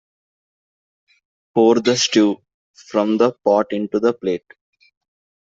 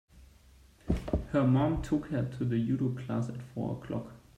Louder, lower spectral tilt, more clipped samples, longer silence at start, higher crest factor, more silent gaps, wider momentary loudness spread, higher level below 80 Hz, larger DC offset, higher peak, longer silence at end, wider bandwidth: first, -18 LUFS vs -32 LUFS; second, -4 dB/octave vs -8.5 dB/octave; neither; first, 1.55 s vs 0.15 s; about the same, 18 dB vs 18 dB; first, 2.54-2.74 s vs none; about the same, 9 LU vs 11 LU; second, -64 dBFS vs -46 dBFS; neither; first, -2 dBFS vs -14 dBFS; first, 1.05 s vs 0.2 s; second, 7.8 kHz vs 9.8 kHz